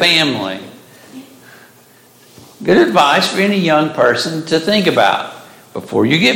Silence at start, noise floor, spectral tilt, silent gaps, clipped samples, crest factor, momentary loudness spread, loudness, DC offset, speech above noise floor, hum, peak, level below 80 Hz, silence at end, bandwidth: 0 s; -46 dBFS; -4.5 dB/octave; none; under 0.1%; 14 dB; 13 LU; -13 LUFS; under 0.1%; 33 dB; none; 0 dBFS; -58 dBFS; 0 s; 17 kHz